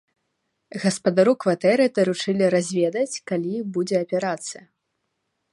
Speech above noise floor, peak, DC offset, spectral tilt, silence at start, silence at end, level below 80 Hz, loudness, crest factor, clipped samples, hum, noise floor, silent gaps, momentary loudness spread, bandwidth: 55 dB; -4 dBFS; under 0.1%; -5 dB/octave; 0.75 s; 0.95 s; -72 dBFS; -22 LUFS; 18 dB; under 0.1%; none; -76 dBFS; none; 9 LU; 11.5 kHz